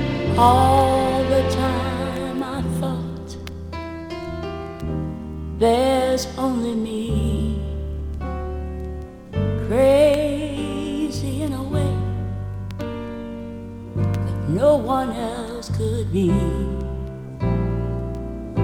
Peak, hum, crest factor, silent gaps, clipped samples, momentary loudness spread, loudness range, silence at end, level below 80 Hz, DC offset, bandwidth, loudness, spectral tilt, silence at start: -2 dBFS; none; 20 dB; none; under 0.1%; 15 LU; 6 LU; 0 s; -34 dBFS; under 0.1%; 19 kHz; -22 LUFS; -7 dB/octave; 0 s